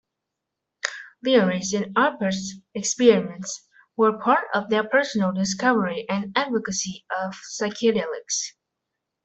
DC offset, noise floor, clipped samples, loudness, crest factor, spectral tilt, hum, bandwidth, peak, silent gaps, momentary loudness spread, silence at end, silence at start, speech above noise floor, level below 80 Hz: under 0.1%; -83 dBFS; under 0.1%; -23 LUFS; 20 dB; -4 dB/octave; none; 8.4 kHz; -4 dBFS; none; 12 LU; 0.75 s; 0.85 s; 60 dB; -66 dBFS